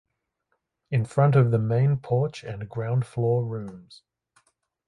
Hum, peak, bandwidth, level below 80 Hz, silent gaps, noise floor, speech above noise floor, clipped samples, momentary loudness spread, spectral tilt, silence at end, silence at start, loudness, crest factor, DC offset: none; -8 dBFS; 10.5 kHz; -60 dBFS; none; -77 dBFS; 53 dB; under 0.1%; 14 LU; -9 dB/octave; 0.95 s; 0.9 s; -24 LUFS; 16 dB; under 0.1%